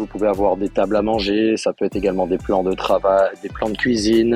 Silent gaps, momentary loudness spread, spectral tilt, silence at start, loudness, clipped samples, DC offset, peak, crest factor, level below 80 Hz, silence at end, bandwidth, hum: none; 5 LU; -5.5 dB/octave; 0 s; -19 LUFS; under 0.1%; under 0.1%; -4 dBFS; 14 dB; -40 dBFS; 0 s; 14.5 kHz; none